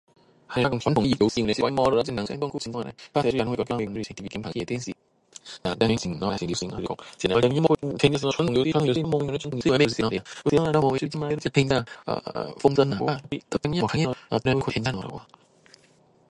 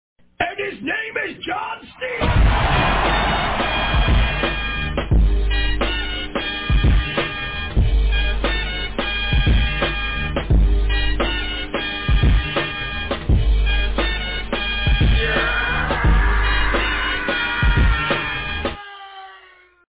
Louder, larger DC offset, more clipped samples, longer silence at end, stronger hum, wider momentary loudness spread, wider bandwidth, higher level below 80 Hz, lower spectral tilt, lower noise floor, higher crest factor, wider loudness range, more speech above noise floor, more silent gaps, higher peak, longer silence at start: second, -25 LUFS vs -20 LUFS; neither; neither; first, 1.05 s vs 0.6 s; neither; first, 11 LU vs 7 LU; first, 11.5 kHz vs 4 kHz; second, -50 dBFS vs -22 dBFS; second, -6 dB/octave vs -9.5 dB/octave; first, -59 dBFS vs -49 dBFS; first, 20 dB vs 12 dB; first, 6 LU vs 2 LU; first, 35 dB vs 25 dB; neither; first, -4 dBFS vs -8 dBFS; about the same, 0.5 s vs 0.4 s